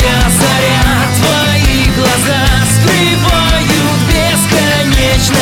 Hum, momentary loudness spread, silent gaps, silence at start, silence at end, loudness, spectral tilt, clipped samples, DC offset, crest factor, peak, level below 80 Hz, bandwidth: none; 1 LU; none; 0 s; 0 s; -9 LUFS; -4 dB/octave; under 0.1%; under 0.1%; 10 dB; 0 dBFS; -18 dBFS; 19.5 kHz